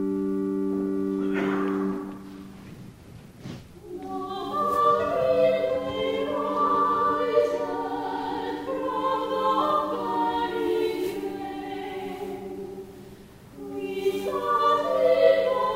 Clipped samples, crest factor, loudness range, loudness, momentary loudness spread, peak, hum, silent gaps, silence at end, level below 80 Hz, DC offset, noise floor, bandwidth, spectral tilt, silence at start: under 0.1%; 20 dB; 8 LU; -26 LUFS; 19 LU; -6 dBFS; none; none; 0 s; -58 dBFS; under 0.1%; -46 dBFS; 16 kHz; -6 dB/octave; 0 s